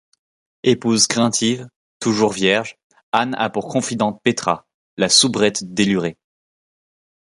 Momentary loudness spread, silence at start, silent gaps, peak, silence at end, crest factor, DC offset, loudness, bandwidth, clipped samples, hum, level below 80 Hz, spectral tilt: 9 LU; 0.65 s; 1.76-2.00 s, 2.84-2.90 s, 3.03-3.12 s, 4.74-4.97 s; 0 dBFS; 1.15 s; 20 dB; under 0.1%; -18 LUFS; 11.5 kHz; under 0.1%; none; -58 dBFS; -3 dB/octave